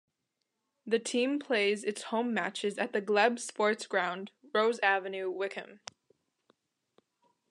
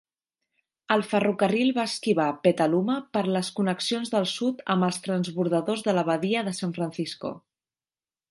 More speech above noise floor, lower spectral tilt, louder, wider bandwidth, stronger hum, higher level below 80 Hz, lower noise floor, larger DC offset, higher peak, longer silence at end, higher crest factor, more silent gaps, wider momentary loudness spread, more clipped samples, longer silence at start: second, 53 dB vs over 65 dB; second, -3 dB/octave vs -5.5 dB/octave; second, -31 LUFS vs -26 LUFS; about the same, 11.5 kHz vs 11.5 kHz; neither; second, under -90 dBFS vs -72 dBFS; second, -84 dBFS vs under -90 dBFS; neither; second, -12 dBFS vs -6 dBFS; first, 1.75 s vs 0.9 s; about the same, 22 dB vs 20 dB; neither; first, 14 LU vs 7 LU; neither; about the same, 0.85 s vs 0.9 s